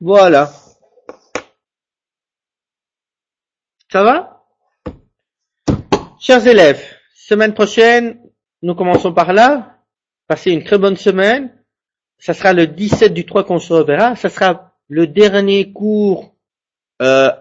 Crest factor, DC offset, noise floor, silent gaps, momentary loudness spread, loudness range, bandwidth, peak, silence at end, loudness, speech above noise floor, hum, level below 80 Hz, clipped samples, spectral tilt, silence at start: 14 dB; under 0.1%; under -90 dBFS; none; 16 LU; 8 LU; 8 kHz; 0 dBFS; 0.05 s; -12 LUFS; over 79 dB; none; -46 dBFS; under 0.1%; -5.5 dB/octave; 0 s